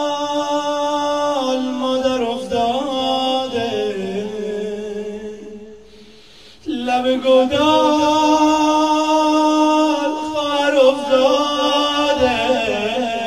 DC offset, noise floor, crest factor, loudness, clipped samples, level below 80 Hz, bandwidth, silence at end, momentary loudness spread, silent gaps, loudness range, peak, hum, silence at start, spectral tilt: 0.4%; -45 dBFS; 16 dB; -17 LUFS; under 0.1%; -50 dBFS; 14.5 kHz; 0 s; 11 LU; none; 9 LU; -2 dBFS; none; 0 s; -3.5 dB/octave